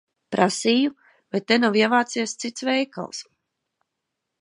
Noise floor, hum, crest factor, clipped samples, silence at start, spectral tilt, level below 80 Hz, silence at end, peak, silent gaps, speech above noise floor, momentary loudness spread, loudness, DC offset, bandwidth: -81 dBFS; none; 22 dB; under 0.1%; 0.3 s; -3.5 dB/octave; -76 dBFS; 1.2 s; -2 dBFS; none; 59 dB; 11 LU; -22 LUFS; under 0.1%; 11 kHz